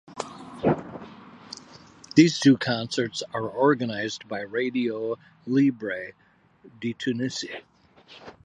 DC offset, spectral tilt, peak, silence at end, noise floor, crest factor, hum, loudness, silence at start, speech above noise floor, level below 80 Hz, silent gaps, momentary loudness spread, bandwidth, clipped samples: under 0.1%; -5.5 dB/octave; -2 dBFS; 0.15 s; -49 dBFS; 24 dB; none; -25 LUFS; 0.1 s; 25 dB; -64 dBFS; none; 22 LU; 9.8 kHz; under 0.1%